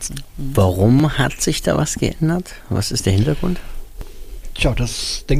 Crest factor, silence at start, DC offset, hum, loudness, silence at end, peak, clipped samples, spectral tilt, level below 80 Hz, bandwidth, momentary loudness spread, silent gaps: 16 dB; 0 s; under 0.1%; none; -19 LUFS; 0 s; -2 dBFS; under 0.1%; -5 dB/octave; -28 dBFS; 15.5 kHz; 23 LU; none